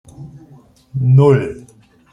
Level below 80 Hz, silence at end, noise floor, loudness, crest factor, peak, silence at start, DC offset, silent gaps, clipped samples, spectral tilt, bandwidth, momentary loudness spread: -50 dBFS; 0.55 s; -46 dBFS; -13 LUFS; 14 dB; -2 dBFS; 0.2 s; under 0.1%; none; under 0.1%; -9.5 dB/octave; 5.2 kHz; 18 LU